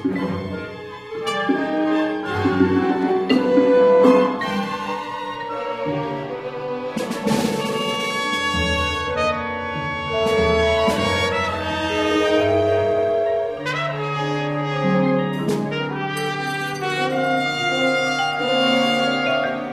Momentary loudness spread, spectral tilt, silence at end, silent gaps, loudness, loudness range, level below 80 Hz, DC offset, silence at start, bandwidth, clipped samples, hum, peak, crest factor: 9 LU; -5 dB/octave; 0 s; none; -20 LUFS; 5 LU; -44 dBFS; under 0.1%; 0 s; 15.5 kHz; under 0.1%; none; -2 dBFS; 18 dB